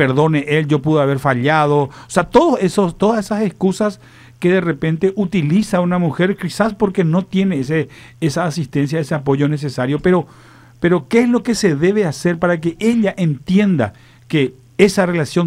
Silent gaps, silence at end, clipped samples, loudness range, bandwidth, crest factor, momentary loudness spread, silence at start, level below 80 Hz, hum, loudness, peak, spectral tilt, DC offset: none; 0 s; under 0.1%; 3 LU; 14.5 kHz; 16 dB; 6 LU; 0 s; -48 dBFS; none; -16 LUFS; 0 dBFS; -6.5 dB/octave; under 0.1%